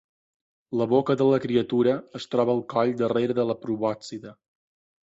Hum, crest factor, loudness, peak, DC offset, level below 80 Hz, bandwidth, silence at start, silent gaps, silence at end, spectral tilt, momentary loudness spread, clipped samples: none; 16 dB; -24 LUFS; -8 dBFS; under 0.1%; -64 dBFS; 8 kHz; 0.7 s; none; 0.7 s; -7.5 dB/octave; 9 LU; under 0.1%